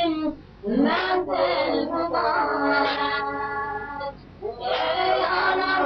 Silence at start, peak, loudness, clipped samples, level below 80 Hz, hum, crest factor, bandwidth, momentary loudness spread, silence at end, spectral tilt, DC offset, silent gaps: 0 s; -8 dBFS; -24 LUFS; under 0.1%; -52 dBFS; none; 16 dB; 6.2 kHz; 11 LU; 0 s; -6.5 dB/octave; under 0.1%; none